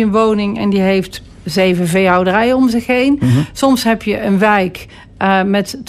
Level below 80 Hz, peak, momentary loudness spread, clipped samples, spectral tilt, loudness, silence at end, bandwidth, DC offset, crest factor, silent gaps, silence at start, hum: -40 dBFS; -2 dBFS; 7 LU; under 0.1%; -6 dB/octave; -13 LUFS; 0.05 s; 14.5 kHz; under 0.1%; 12 dB; none; 0 s; none